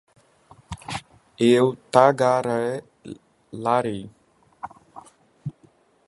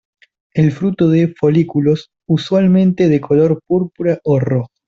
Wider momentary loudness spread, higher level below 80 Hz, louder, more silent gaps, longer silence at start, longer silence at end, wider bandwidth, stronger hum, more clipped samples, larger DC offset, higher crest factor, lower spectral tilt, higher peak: first, 24 LU vs 6 LU; second, -58 dBFS vs -52 dBFS; second, -21 LUFS vs -15 LUFS; neither; first, 0.7 s vs 0.55 s; first, 0.55 s vs 0.2 s; first, 11.5 kHz vs 7.2 kHz; neither; neither; neither; first, 24 dB vs 12 dB; second, -6 dB/octave vs -9 dB/octave; about the same, 0 dBFS vs -2 dBFS